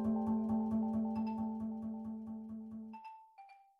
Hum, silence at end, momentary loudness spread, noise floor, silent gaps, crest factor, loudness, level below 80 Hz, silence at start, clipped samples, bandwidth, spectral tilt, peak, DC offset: none; 0.2 s; 19 LU; -60 dBFS; none; 12 dB; -39 LUFS; -66 dBFS; 0 s; under 0.1%; 5.4 kHz; -10.5 dB/octave; -26 dBFS; under 0.1%